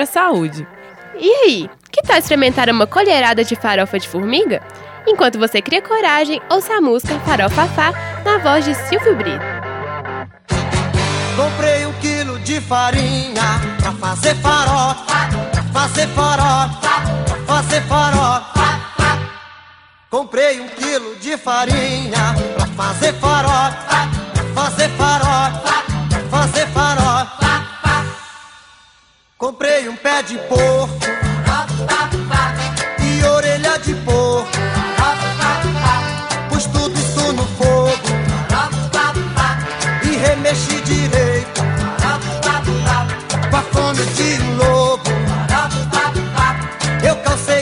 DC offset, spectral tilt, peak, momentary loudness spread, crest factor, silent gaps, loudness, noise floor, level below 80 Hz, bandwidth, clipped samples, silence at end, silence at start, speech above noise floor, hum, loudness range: under 0.1%; -4.5 dB/octave; 0 dBFS; 7 LU; 16 dB; none; -16 LUFS; -52 dBFS; -30 dBFS; 16 kHz; under 0.1%; 0 s; 0 s; 37 dB; none; 3 LU